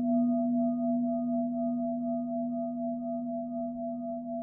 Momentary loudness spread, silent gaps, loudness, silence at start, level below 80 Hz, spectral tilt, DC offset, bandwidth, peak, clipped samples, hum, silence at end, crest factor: 8 LU; none; -32 LUFS; 0 s; -68 dBFS; -15 dB/octave; under 0.1%; 1.3 kHz; -20 dBFS; under 0.1%; none; 0 s; 12 dB